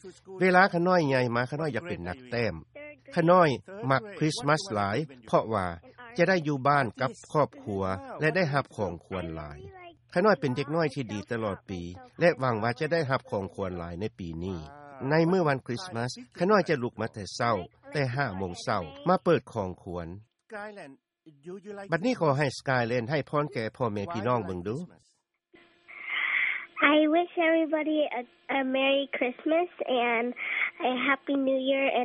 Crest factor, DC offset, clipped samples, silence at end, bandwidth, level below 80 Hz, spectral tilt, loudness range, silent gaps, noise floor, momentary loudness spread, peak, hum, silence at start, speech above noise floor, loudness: 22 dB; under 0.1%; under 0.1%; 0 s; 11.5 kHz; -60 dBFS; -6 dB/octave; 5 LU; none; -63 dBFS; 15 LU; -6 dBFS; none; 0.05 s; 35 dB; -28 LUFS